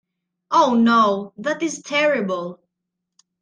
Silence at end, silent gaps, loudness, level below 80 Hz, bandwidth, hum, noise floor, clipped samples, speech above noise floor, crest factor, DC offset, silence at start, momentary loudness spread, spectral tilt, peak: 0.85 s; none; -19 LUFS; -68 dBFS; 9.8 kHz; none; -80 dBFS; under 0.1%; 61 dB; 16 dB; under 0.1%; 0.5 s; 11 LU; -4.5 dB/octave; -4 dBFS